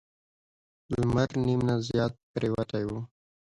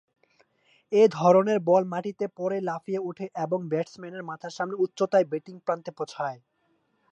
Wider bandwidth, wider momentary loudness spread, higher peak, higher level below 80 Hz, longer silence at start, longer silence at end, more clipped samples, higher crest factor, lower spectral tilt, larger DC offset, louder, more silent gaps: first, 11 kHz vs 8.2 kHz; second, 9 LU vs 15 LU; second, -12 dBFS vs -6 dBFS; first, -52 dBFS vs -80 dBFS; about the same, 0.9 s vs 0.9 s; second, 0.55 s vs 0.75 s; neither; about the same, 18 dB vs 20 dB; about the same, -7.5 dB/octave vs -6.5 dB/octave; neither; second, -29 LUFS vs -26 LUFS; first, 2.23-2.34 s vs none